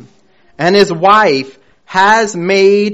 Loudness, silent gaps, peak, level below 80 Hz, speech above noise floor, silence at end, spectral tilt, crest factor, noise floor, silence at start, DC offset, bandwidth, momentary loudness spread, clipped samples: -10 LUFS; none; 0 dBFS; -52 dBFS; 41 dB; 0 s; -4.5 dB/octave; 12 dB; -51 dBFS; 0.6 s; under 0.1%; 8.2 kHz; 9 LU; 0.4%